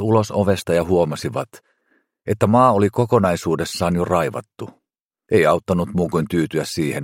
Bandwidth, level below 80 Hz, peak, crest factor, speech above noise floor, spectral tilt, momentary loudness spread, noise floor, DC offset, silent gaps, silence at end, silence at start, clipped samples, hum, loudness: 16.5 kHz; -48 dBFS; -2 dBFS; 18 dB; 49 dB; -6.5 dB/octave; 14 LU; -67 dBFS; under 0.1%; 5.00-5.10 s; 0 s; 0 s; under 0.1%; none; -19 LUFS